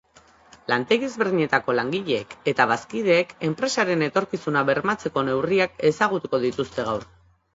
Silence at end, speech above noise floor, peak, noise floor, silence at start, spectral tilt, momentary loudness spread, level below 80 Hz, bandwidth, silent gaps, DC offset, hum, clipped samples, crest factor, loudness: 0.5 s; 31 dB; -2 dBFS; -54 dBFS; 0.7 s; -5 dB/octave; 6 LU; -60 dBFS; 8 kHz; none; under 0.1%; none; under 0.1%; 20 dB; -23 LUFS